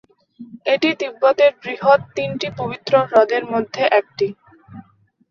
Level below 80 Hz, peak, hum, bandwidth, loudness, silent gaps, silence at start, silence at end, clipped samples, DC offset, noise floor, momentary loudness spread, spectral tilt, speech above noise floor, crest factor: -62 dBFS; -2 dBFS; none; 7 kHz; -18 LUFS; none; 0.4 s; 0.5 s; under 0.1%; under 0.1%; -53 dBFS; 10 LU; -5.5 dB/octave; 36 dB; 18 dB